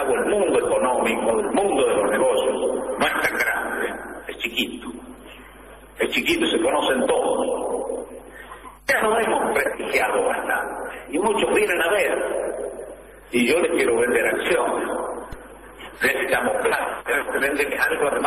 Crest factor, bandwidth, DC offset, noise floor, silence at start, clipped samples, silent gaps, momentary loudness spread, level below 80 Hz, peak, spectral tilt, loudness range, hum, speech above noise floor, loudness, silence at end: 14 dB; 13 kHz; under 0.1%; -44 dBFS; 0 s; under 0.1%; none; 16 LU; -50 dBFS; -8 dBFS; -3 dB/octave; 3 LU; none; 24 dB; -21 LUFS; 0 s